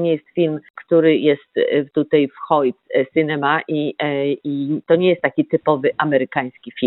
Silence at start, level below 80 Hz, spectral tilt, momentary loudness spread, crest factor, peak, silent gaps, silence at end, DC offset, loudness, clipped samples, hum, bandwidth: 0 s; -68 dBFS; -10.5 dB/octave; 7 LU; 16 dB; -2 dBFS; 0.70-0.74 s; 0 s; under 0.1%; -18 LUFS; under 0.1%; none; 4.1 kHz